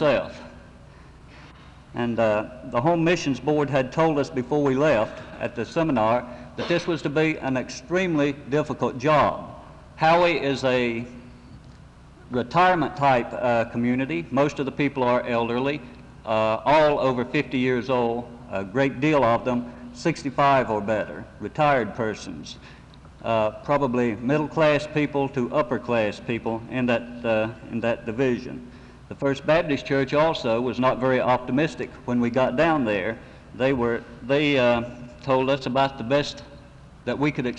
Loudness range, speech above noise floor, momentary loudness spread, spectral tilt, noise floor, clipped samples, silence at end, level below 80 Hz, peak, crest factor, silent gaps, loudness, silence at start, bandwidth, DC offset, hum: 3 LU; 24 dB; 12 LU; -6.5 dB/octave; -47 dBFS; under 0.1%; 0 s; -50 dBFS; -8 dBFS; 16 dB; none; -23 LUFS; 0 s; 9.6 kHz; under 0.1%; none